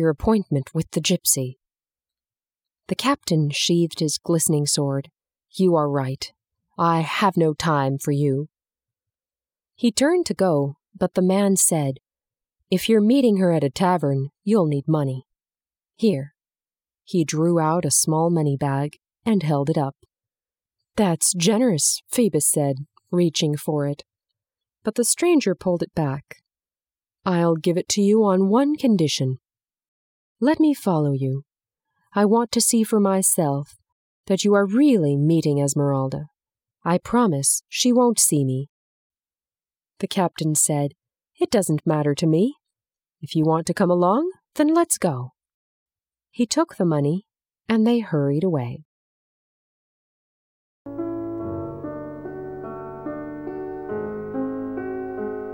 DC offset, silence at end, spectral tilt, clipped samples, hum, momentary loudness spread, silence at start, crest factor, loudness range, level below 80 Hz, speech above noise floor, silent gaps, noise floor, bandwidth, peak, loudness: under 0.1%; 0 s; -5 dB/octave; under 0.1%; none; 14 LU; 0 s; 16 dB; 5 LU; -56 dBFS; over 70 dB; 29.88-30.36 s, 33.92-34.24 s, 38.69-39.10 s, 45.54-45.86 s, 48.85-50.85 s; under -90 dBFS; 18 kHz; -6 dBFS; -21 LUFS